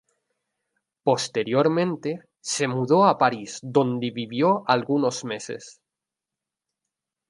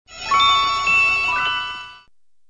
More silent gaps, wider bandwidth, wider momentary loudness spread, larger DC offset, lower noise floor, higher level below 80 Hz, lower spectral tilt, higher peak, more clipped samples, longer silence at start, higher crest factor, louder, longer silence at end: neither; first, 11.5 kHz vs 10 kHz; about the same, 13 LU vs 11 LU; second, under 0.1% vs 0.3%; first, -88 dBFS vs -55 dBFS; second, -74 dBFS vs -48 dBFS; first, -5 dB/octave vs 0 dB/octave; about the same, -4 dBFS vs -6 dBFS; neither; first, 1.05 s vs 0.1 s; first, 22 dB vs 14 dB; second, -23 LUFS vs -16 LUFS; first, 1.55 s vs 0.5 s